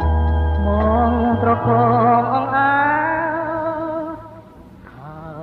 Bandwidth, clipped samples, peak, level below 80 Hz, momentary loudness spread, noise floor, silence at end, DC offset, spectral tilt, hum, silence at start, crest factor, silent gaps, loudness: 4.4 kHz; under 0.1%; -4 dBFS; -26 dBFS; 14 LU; -41 dBFS; 0 s; under 0.1%; -10 dB/octave; none; 0 s; 14 dB; none; -17 LUFS